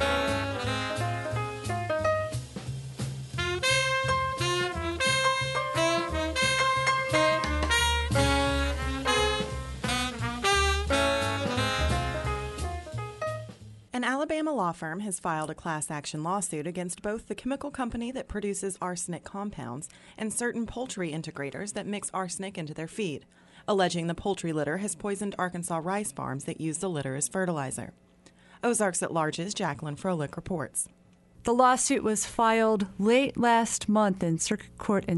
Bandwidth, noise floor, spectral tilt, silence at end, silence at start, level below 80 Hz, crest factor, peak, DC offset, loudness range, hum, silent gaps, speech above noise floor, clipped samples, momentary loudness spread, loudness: 11.5 kHz; -57 dBFS; -4 dB/octave; 0 s; 0 s; -42 dBFS; 20 dB; -8 dBFS; under 0.1%; 8 LU; none; none; 28 dB; under 0.1%; 11 LU; -29 LUFS